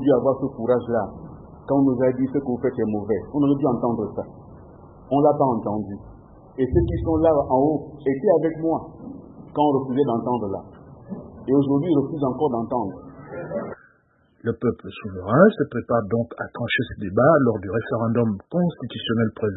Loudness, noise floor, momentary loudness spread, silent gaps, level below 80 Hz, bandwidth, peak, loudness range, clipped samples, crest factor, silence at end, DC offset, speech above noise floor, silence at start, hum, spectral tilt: -22 LUFS; -61 dBFS; 16 LU; none; -44 dBFS; 4 kHz; 0 dBFS; 4 LU; under 0.1%; 22 dB; 0 s; under 0.1%; 39 dB; 0 s; none; -12 dB/octave